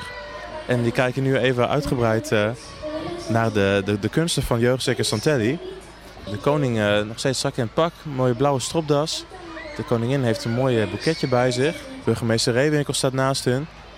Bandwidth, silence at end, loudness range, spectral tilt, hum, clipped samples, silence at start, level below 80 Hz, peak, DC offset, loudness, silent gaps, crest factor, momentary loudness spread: 16 kHz; 0 s; 2 LU; -5 dB/octave; none; under 0.1%; 0 s; -46 dBFS; -6 dBFS; under 0.1%; -22 LUFS; none; 16 dB; 12 LU